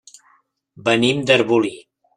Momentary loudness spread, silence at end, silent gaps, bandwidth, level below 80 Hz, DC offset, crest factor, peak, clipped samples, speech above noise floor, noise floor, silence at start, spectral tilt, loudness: 9 LU; 0.4 s; none; 11.5 kHz; -62 dBFS; under 0.1%; 18 dB; -2 dBFS; under 0.1%; 42 dB; -59 dBFS; 0.85 s; -5 dB/octave; -17 LUFS